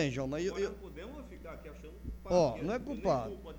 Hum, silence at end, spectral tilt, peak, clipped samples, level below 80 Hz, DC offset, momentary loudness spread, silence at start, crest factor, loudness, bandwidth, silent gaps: 60 Hz at -50 dBFS; 0 s; -6 dB/octave; -16 dBFS; under 0.1%; -50 dBFS; under 0.1%; 18 LU; 0 s; 20 dB; -34 LUFS; over 20 kHz; none